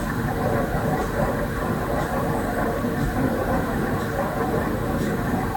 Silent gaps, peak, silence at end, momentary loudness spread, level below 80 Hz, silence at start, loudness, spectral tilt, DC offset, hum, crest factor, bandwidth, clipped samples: none; -10 dBFS; 0 s; 1 LU; -34 dBFS; 0 s; -24 LUFS; -6.5 dB/octave; under 0.1%; none; 14 dB; 18 kHz; under 0.1%